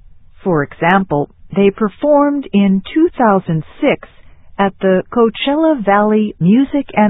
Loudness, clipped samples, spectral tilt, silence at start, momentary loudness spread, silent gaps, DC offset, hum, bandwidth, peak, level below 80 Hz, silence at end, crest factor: -14 LUFS; under 0.1%; -10.5 dB/octave; 0.45 s; 7 LU; none; under 0.1%; none; 4 kHz; 0 dBFS; -46 dBFS; 0 s; 14 dB